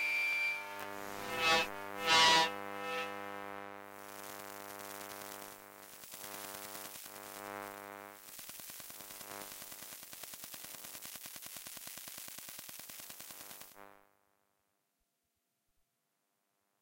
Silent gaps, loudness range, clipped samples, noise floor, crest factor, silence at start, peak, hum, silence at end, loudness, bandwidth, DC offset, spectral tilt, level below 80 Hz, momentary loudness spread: none; 17 LU; under 0.1%; -84 dBFS; 24 dB; 0 s; -16 dBFS; none; 2.85 s; -37 LUFS; 17 kHz; under 0.1%; -0.5 dB/octave; -74 dBFS; 19 LU